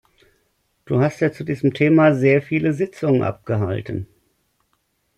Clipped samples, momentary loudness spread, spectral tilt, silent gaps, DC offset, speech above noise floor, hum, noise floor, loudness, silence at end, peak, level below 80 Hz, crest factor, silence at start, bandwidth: under 0.1%; 12 LU; -8.5 dB/octave; none; under 0.1%; 50 dB; none; -68 dBFS; -19 LUFS; 1.15 s; -4 dBFS; -58 dBFS; 18 dB; 0.9 s; 11 kHz